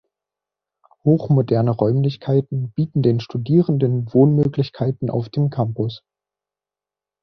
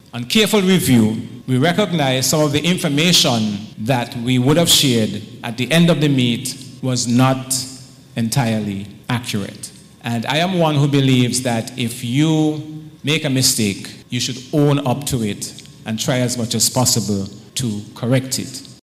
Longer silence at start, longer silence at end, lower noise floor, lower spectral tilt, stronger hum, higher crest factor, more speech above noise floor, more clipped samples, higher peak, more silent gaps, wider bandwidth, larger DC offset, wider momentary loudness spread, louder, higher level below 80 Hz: first, 1.05 s vs 0.15 s; first, 1.25 s vs 0.1 s; first, -89 dBFS vs -37 dBFS; first, -10.5 dB/octave vs -4.5 dB/octave; first, 50 Hz at -45 dBFS vs none; about the same, 18 dB vs 14 dB; first, 71 dB vs 21 dB; neither; about the same, -2 dBFS vs -4 dBFS; neither; second, 6 kHz vs 16 kHz; neither; second, 8 LU vs 13 LU; about the same, -19 LUFS vs -17 LUFS; about the same, -54 dBFS vs -52 dBFS